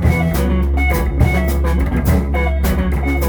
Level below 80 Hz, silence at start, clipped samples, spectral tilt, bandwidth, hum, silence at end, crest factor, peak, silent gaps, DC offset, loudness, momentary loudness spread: -16 dBFS; 0 s; under 0.1%; -7 dB/octave; over 20 kHz; none; 0 s; 12 dB; -2 dBFS; none; under 0.1%; -16 LUFS; 2 LU